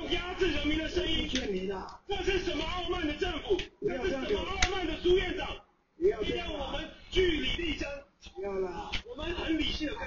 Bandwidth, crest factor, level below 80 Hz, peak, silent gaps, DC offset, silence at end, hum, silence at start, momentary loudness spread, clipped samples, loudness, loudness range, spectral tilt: 7.2 kHz; 24 dB; -42 dBFS; -8 dBFS; none; under 0.1%; 0 s; none; 0 s; 9 LU; under 0.1%; -32 LUFS; 2 LU; -2.5 dB/octave